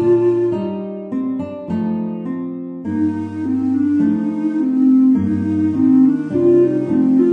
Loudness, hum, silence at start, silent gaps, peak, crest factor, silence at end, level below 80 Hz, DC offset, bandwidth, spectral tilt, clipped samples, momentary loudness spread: -17 LUFS; none; 0 s; none; -4 dBFS; 12 dB; 0 s; -58 dBFS; under 0.1%; 3.6 kHz; -10 dB/octave; under 0.1%; 12 LU